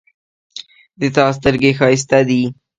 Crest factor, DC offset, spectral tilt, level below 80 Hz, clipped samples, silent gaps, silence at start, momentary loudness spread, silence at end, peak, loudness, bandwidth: 16 dB; under 0.1%; -5.5 dB/octave; -46 dBFS; under 0.1%; none; 0.55 s; 21 LU; 0.25 s; 0 dBFS; -14 LUFS; 9.4 kHz